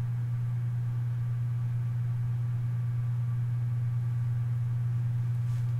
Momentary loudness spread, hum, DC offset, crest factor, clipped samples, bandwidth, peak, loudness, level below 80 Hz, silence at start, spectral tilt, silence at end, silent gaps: 1 LU; none; under 0.1%; 6 dB; under 0.1%; 3.2 kHz; -24 dBFS; -31 LUFS; -56 dBFS; 0 s; -9 dB/octave; 0 s; none